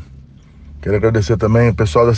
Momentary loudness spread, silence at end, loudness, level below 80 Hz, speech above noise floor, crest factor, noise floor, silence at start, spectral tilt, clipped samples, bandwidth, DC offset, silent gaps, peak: 6 LU; 0 s; -14 LUFS; -32 dBFS; 27 dB; 14 dB; -40 dBFS; 0 s; -7.5 dB/octave; under 0.1%; 8.8 kHz; under 0.1%; none; 0 dBFS